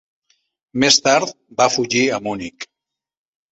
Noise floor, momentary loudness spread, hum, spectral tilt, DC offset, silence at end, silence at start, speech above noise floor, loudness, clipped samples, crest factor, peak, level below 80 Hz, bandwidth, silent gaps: -84 dBFS; 18 LU; none; -2.5 dB/octave; under 0.1%; 0.9 s; 0.75 s; 67 dB; -17 LUFS; under 0.1%; 20 dB; 0 dBFS; -56 dBFS; 8.2 kHz; none